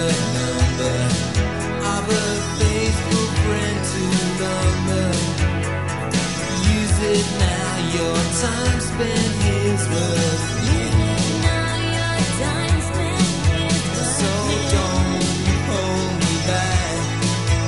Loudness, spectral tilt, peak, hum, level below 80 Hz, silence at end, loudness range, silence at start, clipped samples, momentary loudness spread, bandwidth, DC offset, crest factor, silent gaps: -20 LUFS; -4.5 dB/octave; -4 dBFS; none; -28 dBFS; 0 s; 1 LU; 0 s; under 0.1%; 3 LU; 11.5 kHz; 0.9%; 16 dB; none